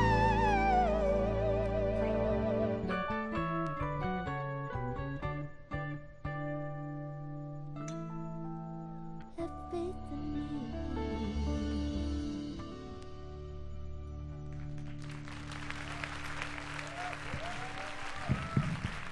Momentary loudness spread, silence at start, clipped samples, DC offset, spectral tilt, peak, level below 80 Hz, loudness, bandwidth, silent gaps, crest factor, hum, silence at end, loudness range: 13 LU; 0 s; under 0.1%; under 0.1%; -7 dB/octave; -16 dBFS; -44 dBFS; -37 LUFS; 12 kHz; none; 18 dB; none; 0 s; 10 LU